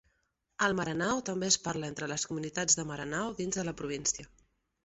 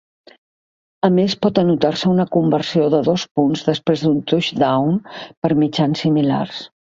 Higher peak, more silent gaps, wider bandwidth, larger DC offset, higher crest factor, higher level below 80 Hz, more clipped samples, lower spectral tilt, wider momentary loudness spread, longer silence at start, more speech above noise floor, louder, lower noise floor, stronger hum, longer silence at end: second, -10 dBFS vs 0 dBFS; second, none vs 3.31-3.35 s, 5.37-5.42 s; about the same, 8.2 kHz vs 7.6 kHz; neither; first, 24 dB vs 16 dB; second, -62 dBFS vs -56 dBFS; neither; second, -2.5 dB/octave vs -7 dB/octave; first, 8 LU vs 5 LU; second, 0.6 s vs 1.05 s; second, 45 dB vs over 73 dB; second, -32 LUFS vs -17 LUFS; second, -78 dBFS vs under -90 dBFS; neither; first, 0.6 s vs 0.25 s